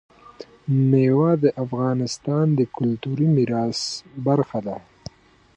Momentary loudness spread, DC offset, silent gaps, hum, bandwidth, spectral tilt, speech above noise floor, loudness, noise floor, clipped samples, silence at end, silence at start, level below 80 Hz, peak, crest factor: 16 LU; under 0.1%; none; none; 9.6 kHz; -7 dB/octave; 23 dB; -21 LUFS; -43 dBFS; under 0.1%; 0.8 s; 0.4 s; -60 dBFS; -6 dBFS; 16 dB